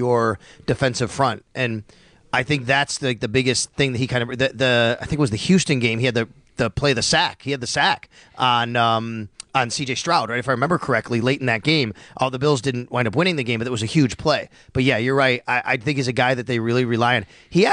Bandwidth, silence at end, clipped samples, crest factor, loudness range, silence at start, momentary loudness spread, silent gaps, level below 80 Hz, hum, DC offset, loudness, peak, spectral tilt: 10.5 kHz; 0 s; under 0.1%; 16 dB; 2 LU; 0 s; 7 LU; none; -48 dBFS; none; under 0.1%; -20 LUFS; -4 dBFS; -4.5 dB/octave